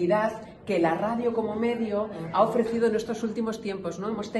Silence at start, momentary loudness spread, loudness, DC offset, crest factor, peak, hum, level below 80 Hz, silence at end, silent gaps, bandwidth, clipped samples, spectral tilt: 0 s; 8 LU; -27 LUFS; under 0.1%; 18 dB; -8 dBFS; none; -60 dBFS; 0 s; none; 12.5 kHz; under 0.1%; -6.5 dB/octave